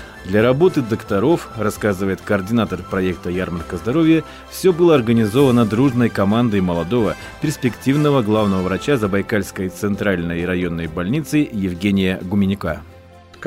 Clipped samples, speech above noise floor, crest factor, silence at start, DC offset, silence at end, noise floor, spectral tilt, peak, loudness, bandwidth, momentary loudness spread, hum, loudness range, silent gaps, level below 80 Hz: under 0.1%; 25 dB; 14 dB; 0 s; under 0.1%; 0 s; -42 dBFS; -7 dB/octave; -4 dBFS; -18 LUFS; 16 kHz; 9 LU; none; 4 LU; none; -46 dBFS